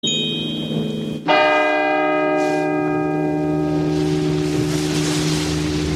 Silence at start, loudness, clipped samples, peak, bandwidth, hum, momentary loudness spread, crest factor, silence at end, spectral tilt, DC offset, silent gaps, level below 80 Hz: 0.05 s; -19 LUFS; under 0.1%; -2 dBFS; 14 kHz; none; 7 LU; 16 dB; 0 s; -5 dB/octave; under 0.1%; none; -40 dBFS